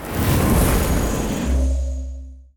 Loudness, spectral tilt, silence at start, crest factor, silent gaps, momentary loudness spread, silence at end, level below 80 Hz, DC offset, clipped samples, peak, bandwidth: -20 LUFS; -5.5 dB/octave; 0 s; 12 dB; none; 13 LU; 0.15 s; -24 dBFS; under 0.1%; under 0.1%; -6 dBFS; over 20 kHz